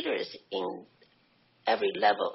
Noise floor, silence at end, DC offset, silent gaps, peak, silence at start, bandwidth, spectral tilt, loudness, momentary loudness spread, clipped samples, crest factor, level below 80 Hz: -66 dBFS; 0 s; under 0.1%; none; -10 dBFS; 0 s; 6 kHz; -0.5 dB/octave; -30 LUFS; 11 LU; under 0.1%; 20 dB; -82 dBFS